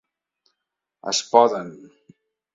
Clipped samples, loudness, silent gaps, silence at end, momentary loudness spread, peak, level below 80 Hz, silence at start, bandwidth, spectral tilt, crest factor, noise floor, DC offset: under 0.1%; -20 LUFS; none; 0.8 s; 19 LU; 0 dBFS; -72 dBFS; 1.05 s; 7.8 kHz; -2.5 dB/octave; 24 dB; -82 dBFS; under 0.1%